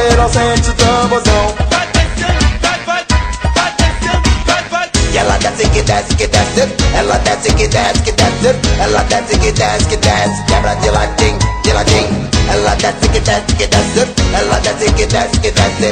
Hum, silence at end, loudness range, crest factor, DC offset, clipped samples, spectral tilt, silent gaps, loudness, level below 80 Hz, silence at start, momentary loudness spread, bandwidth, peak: none; 0 s; 1 LU; 12 dB; under 0.1%; under 0.1%; -4 dB/octave; none; -12 LUFS; -18 dBFS; 0 s; 3 LU; 9.8 kHz; 0 dBFS